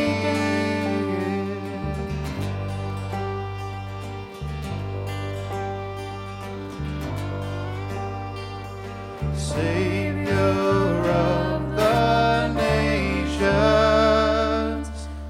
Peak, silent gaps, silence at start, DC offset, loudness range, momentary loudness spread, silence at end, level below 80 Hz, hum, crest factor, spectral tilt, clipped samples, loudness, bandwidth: -6 dBFS; none; 0 s; under 0.1%; 11 LU; 14 LU; 0 s; -36 dBFS; none; 16 dB; -6.5 dB/octave; under 0.1%; -24 LUFS; 15.5 kHz